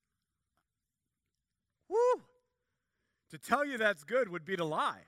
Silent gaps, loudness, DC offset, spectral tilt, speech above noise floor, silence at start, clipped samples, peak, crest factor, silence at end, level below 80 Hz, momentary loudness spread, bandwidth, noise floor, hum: none; -33 LUFS; under 0.1%; -4.5 dB/octave; 55 dB; 1.9 s; under 0.1%; -14 dBFS; 24 dB; 0.1 s; -82 dBFS; 6 LU; 15.5 kHz; -89 dBFS; none